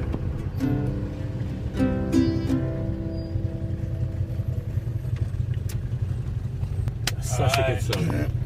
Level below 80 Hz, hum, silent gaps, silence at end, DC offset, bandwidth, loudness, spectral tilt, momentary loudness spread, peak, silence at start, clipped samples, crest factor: -34 dBFS; none; none; 0 s; under 0.1%; 15.5 kHz; -27 LUFS; -6.5 dB/octave; 8 LU; -6 dBFS; 0 s; under 0.1%; 20 dB